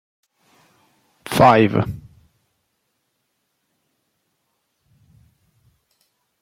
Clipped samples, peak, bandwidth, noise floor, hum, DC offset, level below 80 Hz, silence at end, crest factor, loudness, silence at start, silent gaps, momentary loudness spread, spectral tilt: under 0.1%; -2 dBFS; 16.5 kHz; -72 dBFS; none; under 0.1%; -52 dBFS; 4.45 s; 22 dB; -16 LUFS; 1.25 s; none; 25 LU; -6.5 dB/octave